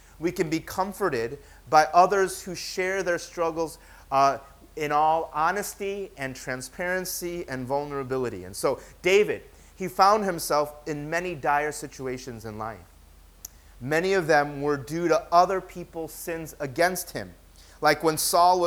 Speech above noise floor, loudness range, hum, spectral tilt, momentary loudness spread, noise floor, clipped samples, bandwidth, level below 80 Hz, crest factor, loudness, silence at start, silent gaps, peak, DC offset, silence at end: 27 dB; 5 LU; none; -4 dB/octave; 16 LU; -52 dBFS; under 0.1%; over 20 kHz; -54 dBFS; 22 dB; -26 LUFS; 0.2 s; none; -4 dBFS; under 0.1%; 0 s